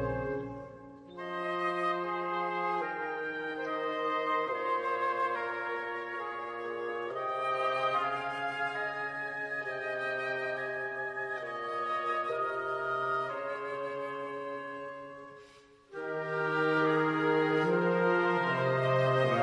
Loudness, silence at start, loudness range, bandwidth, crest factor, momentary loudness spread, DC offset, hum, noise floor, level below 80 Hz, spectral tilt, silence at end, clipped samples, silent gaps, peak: -32 LUFS; 0 s; 6 LU; 10.5 kHz; 18 dB; 11 LU; under 0.1%; none; -58 dBFS; -64 dBFS; -6.5 dB/octave; 0 s; under 0.1%; none; -16 dBFS